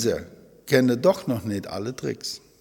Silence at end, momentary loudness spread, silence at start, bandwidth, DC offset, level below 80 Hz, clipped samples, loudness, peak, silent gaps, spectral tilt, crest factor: 0.2 s; 12 LU; 0 s; 18.5 kHz; under 0.1%; -58 dBFS; under 0.1%; -25 LUFS; -4 dBFS; none; -5.5 dB/octave; 22 dB